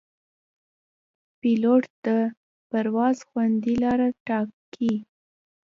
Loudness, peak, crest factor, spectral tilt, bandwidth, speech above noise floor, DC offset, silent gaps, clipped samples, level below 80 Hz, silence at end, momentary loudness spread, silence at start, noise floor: -24 LUFS; -8 dBFS; 16 dB; -7.5 dB/octave; 7.4 kHz; over 67 dB; under 0.1%; 1.90-2.03 s, 2.37-2.70 s, 4.20-4.26 s, 4.53-4.72 s; under 0.1%; -60 dBFS; 0.65 s; 8 LU; 1.45 s; under -90 dBFS